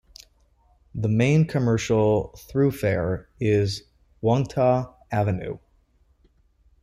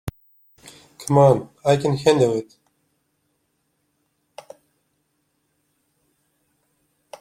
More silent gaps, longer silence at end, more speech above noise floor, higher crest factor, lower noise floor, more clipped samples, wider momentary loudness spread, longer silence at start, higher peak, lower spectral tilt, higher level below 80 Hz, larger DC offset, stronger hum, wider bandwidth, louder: neither; second, 1.25 s vs 4.8 s; second, 40 dB vs 54 dB; second, 16 dB vs 22 dB; second, -62 dBFS vs -71 dBFS; neither; second, 10 LU vs 22 LU; first, 0.95 s vs 0.05 s; second, -8 dBFS vs -2 dBFS; about the same, -7 dB/octave vs -6.5 dB/octave; first, -50 dBFS vs -56 dBFS; neither; neither; about the same, 15 kHz vs 16.5 kHz; second, -23 LUFS vs -18 LUFS